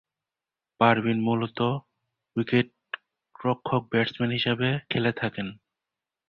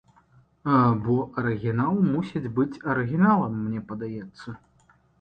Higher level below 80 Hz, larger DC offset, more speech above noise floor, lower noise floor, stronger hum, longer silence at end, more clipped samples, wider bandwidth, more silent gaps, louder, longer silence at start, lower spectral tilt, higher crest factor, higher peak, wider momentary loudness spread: second, -62 dBFS vs -56 dBFS; neither; first, 65 dB vs 37 dB; first, -90 dBFS vs -61 dBFS; neither; about the same, 0.75 s vs 0.65 s; neither; about the same, 5.6 kHz vs 5.2 kHz; neither; about the same, -26 LUFS vs -25 LUFS; first, 0.8 s vs 0.65 s; second, -8.5 dB/octave vs -10 dB/octave; first, 24 dB vs 18 dB; first, -4 dBFS vs -8 dBFS; second, 13 LU vs 16 LU